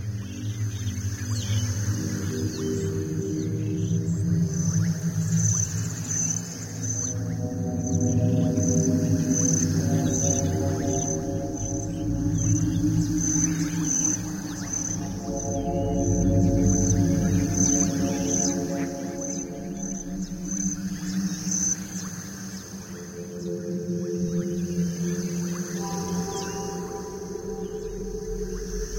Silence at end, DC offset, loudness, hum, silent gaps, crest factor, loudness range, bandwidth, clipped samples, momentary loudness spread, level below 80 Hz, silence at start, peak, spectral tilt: 0 s; under 0.1%; -26 LUFS; none; none; 16 dB; 7 LU; 16.5 kHz; under 0.1%; 11 LU; -42 dBFS; 0 s; -10 dBFS; -5.5 dB/octave